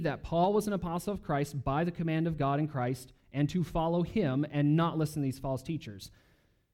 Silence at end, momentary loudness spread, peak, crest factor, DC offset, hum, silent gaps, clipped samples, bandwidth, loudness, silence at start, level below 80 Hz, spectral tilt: 0.65 s; 11 LU; -16 dBFS; 16 dB; under 0.1%; none; none; under 0.1%; 16 kHz; -32 LUFS; 0 s; -52 dBFS; -7.5 dB/octave